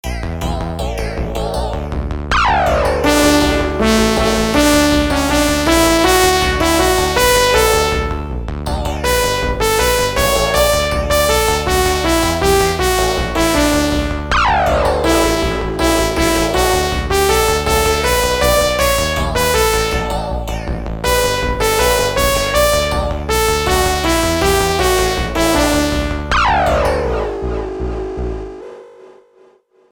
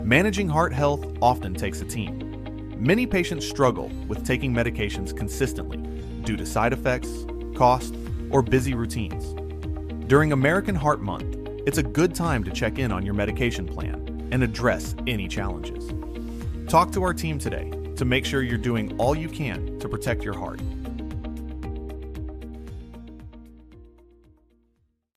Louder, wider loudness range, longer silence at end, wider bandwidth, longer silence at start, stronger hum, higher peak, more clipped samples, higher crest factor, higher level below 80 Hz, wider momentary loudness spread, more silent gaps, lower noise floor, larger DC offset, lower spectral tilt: first, -14 LUFS vs -25 LUFS; second, 3 LU vs 9 LU; second, 0.85 s vs 1.3 s; first, 19.5 kHz vs 14.5 kHz; about the same, 0.05 s vs 0 s; neither; first, 0 dBFS vs -4 dBFS; neither; second, 14 dB vs 22 dB; first, -24 dBFS vs -36 dBFS; second, 10 LU vs 13 LU; neither; second, -50 dBFS vs -69 dBFS; neither; second, -4 dB/octave vs -6 dB/octave